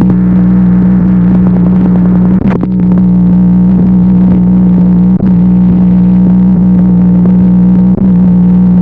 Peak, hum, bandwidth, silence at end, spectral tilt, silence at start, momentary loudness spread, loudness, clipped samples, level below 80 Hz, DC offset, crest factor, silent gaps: 0 dBFS; 60 Hz at -15 dBFS; 2.6 kHz; 0 s; -12.5 dB/octave; 0 s; 1 LU; -6 LUFS; under 0.1%; -22 dBFS; under 0.1%; 4 dB; none